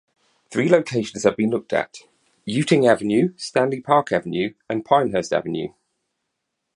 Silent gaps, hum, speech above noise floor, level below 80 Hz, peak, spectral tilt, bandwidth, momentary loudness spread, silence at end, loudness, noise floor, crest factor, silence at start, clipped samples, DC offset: none; none; 58 dB; -60 dBFS; -2 dBFS; -5.5 dB/octave; 11 kHz; 11 LU; 1.1 s; -21 LUFS; -78 dBFS; 20 dB; 0.5 s; under 0.1%; under 0.1%